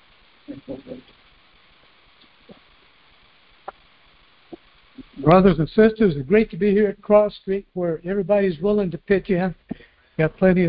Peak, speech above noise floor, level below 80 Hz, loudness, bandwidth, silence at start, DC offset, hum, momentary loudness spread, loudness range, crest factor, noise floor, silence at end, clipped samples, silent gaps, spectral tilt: -2 dBFS; 36 dB; -46 dBFS; -19 LUFS; 5.2 kHz; 0.5 s; under 0.1%; none; 24 LU; 5 LU; 20 dB; -55 dBFS; 0 s; under 0.1%; none; -12 dB/octave